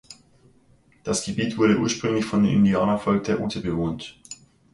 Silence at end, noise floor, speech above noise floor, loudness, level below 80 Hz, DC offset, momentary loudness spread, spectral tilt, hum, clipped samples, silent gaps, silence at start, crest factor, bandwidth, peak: 0.4 s; -58 dBFS; 36 dB; -23 LUFS; -50 dBFS; under 0.1%; 18 LU; -5.5 dB/octave; none; under 0.1%; none; 0.1 s; 16 dB; 11.5 kHz; -8 dBFS